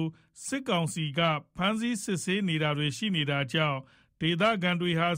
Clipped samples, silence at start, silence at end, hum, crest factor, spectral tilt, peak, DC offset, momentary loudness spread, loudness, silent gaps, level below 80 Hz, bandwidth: under 0.1%; 0 s; 0 s; none; 18 dB; -5 dB/octave; -10 dBFS; under 0.1%; 7 LU; -29 LUFS; none; -64 dBFS; 16 kHz